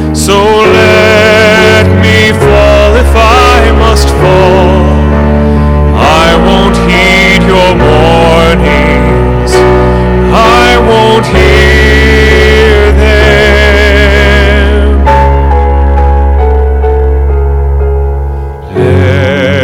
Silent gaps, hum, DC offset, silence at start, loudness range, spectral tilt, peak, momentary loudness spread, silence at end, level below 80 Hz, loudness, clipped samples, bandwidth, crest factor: none; none; under 0.1%; 0 s; 4 LU; -5.5 dB/octave; 0 dBFS; 5 LU; 0 s; -10 dBFS; -5 LUFS; 8%; 14.5 kHz; 4 dB